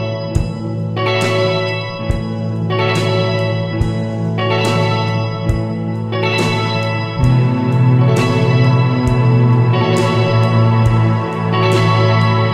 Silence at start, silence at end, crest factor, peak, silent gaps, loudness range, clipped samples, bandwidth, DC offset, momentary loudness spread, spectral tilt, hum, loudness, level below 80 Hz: 0 s; 0 s; 12 dB; -2 dBFS; none; 4 LU; under 0.1%; 10.5 kHz; under 0.1%; 7 LU; -7 dB/octave; none; -15 LUFS; -32 dBFS